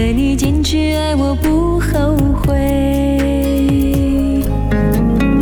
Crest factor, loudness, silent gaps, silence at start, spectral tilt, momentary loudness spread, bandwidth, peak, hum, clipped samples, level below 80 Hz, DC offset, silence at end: 10 dB; -15 LUFS; none; 0 s; -6.5 dB/octave; 2 LU; 18 kHz; -4 dBFS; none; under 0.1%; -20 dBFS; under 0.1%; 0 s